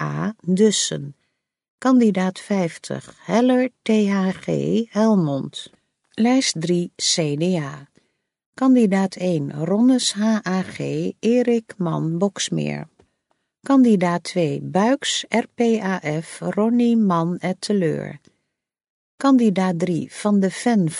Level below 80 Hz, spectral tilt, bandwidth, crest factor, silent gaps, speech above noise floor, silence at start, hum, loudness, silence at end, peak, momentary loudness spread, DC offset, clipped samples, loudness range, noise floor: -66 dBFS; -5 dB/octave; 11.5 kHz; 16 dB; 1.70-1.78 s, 8.46-8.53 s, 18.90-19.18 s; 57 dB; 0 s; none; -20 LUFS; 0 s; -4 dBFS; 10 LU; under 0.1%; under 0.1%; 2 LU; -76 dBFS